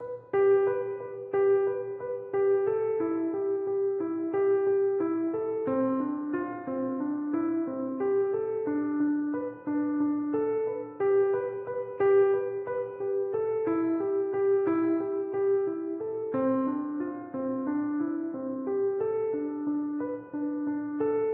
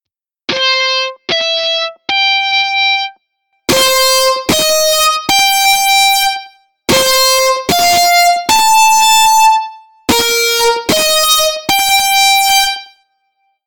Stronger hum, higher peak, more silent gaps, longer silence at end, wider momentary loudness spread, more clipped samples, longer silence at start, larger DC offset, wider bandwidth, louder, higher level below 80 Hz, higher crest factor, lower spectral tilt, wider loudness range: neither; second, -16 dBFS vs -2 dBFS; neither; second, 0 s vs 0.8 s; about the same, 8 LU vs 8 LU; neither; second, 0 s vs 0.5 s; neither; second, 3 kHz vs 19.5 kHz; second, -29 LUFS vs -9 LUFS; second, -76 dBFS vs -44 dBFS; about the same, 12 dB vs 10 dB; first, -8 dB/octave vs -0.5 dB/octave; about the same, 3 LU vs 3 LU